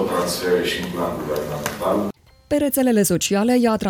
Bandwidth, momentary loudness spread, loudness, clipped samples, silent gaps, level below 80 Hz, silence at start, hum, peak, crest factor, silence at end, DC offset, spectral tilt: 18 kHz; 8 LU; -21 LUFS; under 0.1%; none; -48 dBFS; 0 s; none; -2 dBFS; 18 dB; 0 s; under 0.1%; -4.5 dB/octave